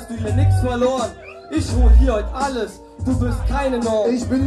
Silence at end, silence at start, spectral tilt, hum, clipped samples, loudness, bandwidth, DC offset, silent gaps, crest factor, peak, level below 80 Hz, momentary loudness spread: 0 s; 0 s; -7 dB/octave; none; under 0.1%; -19 LUFS; 12 kHz; under 0.1%; none; 14 dB; -4 dBFS; -20 dBFS; 12 LU